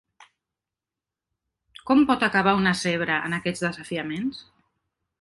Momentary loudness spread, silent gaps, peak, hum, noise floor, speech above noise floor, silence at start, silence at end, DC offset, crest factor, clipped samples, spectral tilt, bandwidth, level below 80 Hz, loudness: 11 LU; none; -6 dBFS; none; -89 dBFS; 66 dB; 1.85 s; 0.8 s; under 0.1%; 20 dB; under 0.1%; -5 dB/octave; 11.5 kHz; -58 dBFS; -23 LUFS